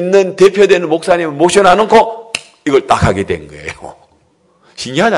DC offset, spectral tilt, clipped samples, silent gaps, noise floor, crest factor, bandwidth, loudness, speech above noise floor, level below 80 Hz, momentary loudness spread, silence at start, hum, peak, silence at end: under 0.1%; -5 dB/octave; 2%; none; -53 dBFS; 12 dB; 12 kHz; -11 LUFS; 43 dB; -40 dBFS; 18 LU; 0 s; none; 0 dBFS; 0 s